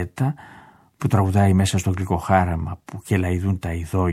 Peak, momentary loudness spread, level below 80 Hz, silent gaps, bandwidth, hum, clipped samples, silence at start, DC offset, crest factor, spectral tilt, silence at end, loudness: -2 dBFS; 11 LU; -40 dBFS; none; 14 kHz; none; under 0.1%; 0 s; under 0.1%; 20 dB; -6.5 dB/octave; 0 s; -21 LUFS